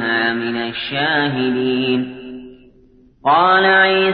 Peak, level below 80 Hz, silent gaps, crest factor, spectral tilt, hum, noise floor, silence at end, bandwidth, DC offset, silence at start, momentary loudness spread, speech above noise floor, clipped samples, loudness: -2 dBFS; -54 dBFS; none; 14 dB; -10 dB/octave; none; -49 dBFS; 0 s; 5.4 kHz; under 0.1%; 0 s; 16 LU; 34 dB; under 0.1%; -16 LUFS